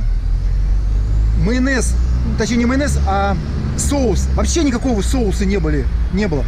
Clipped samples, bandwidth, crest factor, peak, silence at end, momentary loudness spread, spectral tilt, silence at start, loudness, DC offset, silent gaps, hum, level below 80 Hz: under 0.1%; 13.5 kHz; 8 dB; -8 dBFS; 0 s; 4 LU; -5.5 dB/octave; 0 s; -17 LUFS; under 0.1%; none; none; -18 dBFS